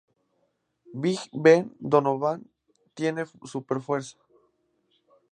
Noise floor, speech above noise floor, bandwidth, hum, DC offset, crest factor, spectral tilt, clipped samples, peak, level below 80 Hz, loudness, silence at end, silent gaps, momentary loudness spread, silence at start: -73 dBFS; 49 dB; 9.6 kHz; none; under 0.1%; 24 dB; -6 dB/octave; under 0.1%; -4 dBFS; -76 dBFS; -25 LUFS; 1.2 s; none; 18 LU; 0.9 s